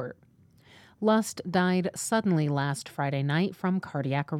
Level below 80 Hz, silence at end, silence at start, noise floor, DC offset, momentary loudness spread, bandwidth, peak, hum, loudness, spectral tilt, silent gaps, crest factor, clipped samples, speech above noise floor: -70 dBFS; 0 s; 0 s; -60 dBFS; under 0.1%; 5 LU; 15.5 kHz; -12 dBFS; none; -28 LUFS; -6 dB/octave; none; 16 dB; under 0.1%; 33 dB